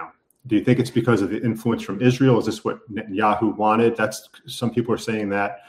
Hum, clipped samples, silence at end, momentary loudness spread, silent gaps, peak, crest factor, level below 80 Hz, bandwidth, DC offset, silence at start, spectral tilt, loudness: none; under 0.1%; 0.1 s; 10 LU; none; -4 dBFS; 18 dB; -60 dBFS; 16 kHz; under 0.1%; 0 s; -6.5 dB/octave; -21 LUFS